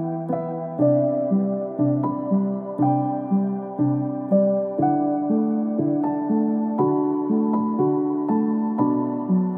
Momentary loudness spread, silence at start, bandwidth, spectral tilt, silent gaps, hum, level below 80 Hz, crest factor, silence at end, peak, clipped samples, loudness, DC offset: 4 LU; 0 s; 2.5 kHz; -14 dB/octave; none; none; -72 dBFS; 14 dB; 0 s; -8 dBFS; under 0.1%; -22 LUFS; under 0.1%